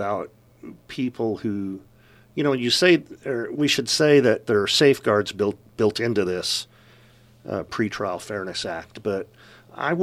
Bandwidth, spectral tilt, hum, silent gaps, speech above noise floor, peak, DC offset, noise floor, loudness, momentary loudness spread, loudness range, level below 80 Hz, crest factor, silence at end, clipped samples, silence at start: 15.5 kHz; -4 dB/octave; none; none; 30 dB; -4 dBFS; under 0.1%; -53 dBFS; -22 LUFS; 15 LU; 9 LU; -60 dBFS; 20 dB; 0 s; under 0.1%; 0 s